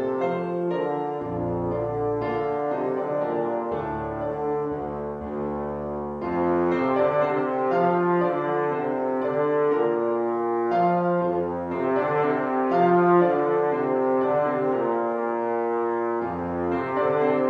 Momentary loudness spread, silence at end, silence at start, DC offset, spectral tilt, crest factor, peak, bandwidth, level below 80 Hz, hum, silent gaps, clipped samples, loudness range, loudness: 7 LU; 0 s; 0 s; under 0.1%; -9.5 dB/octave; 16 dB; -6 dBFS; 5.4 kHz; -54 dBFS; none; none; under 0.1%; 5 LU; -24 LUFS